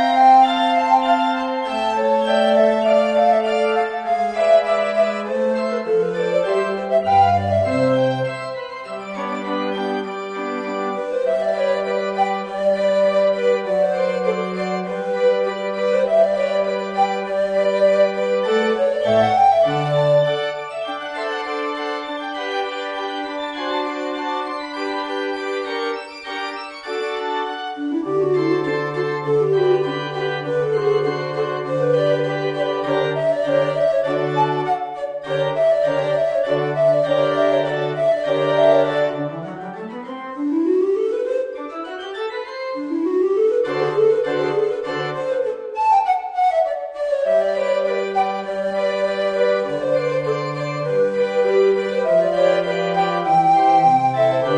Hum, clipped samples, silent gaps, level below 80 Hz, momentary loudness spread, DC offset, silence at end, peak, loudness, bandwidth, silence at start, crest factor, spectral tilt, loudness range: none; under 0.1%; none; -60 dBFS; 10 LU; under 0.1%; 0 s; -4 dBFS; -19 LUFS; 10 kHz; 0 s; 16 dB; -6 dB/octave; 7 LU